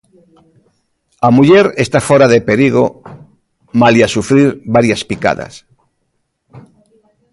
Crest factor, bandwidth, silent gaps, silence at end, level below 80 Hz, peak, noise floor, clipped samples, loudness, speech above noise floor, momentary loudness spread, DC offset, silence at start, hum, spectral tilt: 12 dB; 11.5 kHz; none; 0.75 s; -46 dBFS; 0 dBFS; -66 dBFS; under 0.1%; -11 LUFS; 56 dB; 8 LU; under 0.1%; 1.2 s; none; -6 dB/octave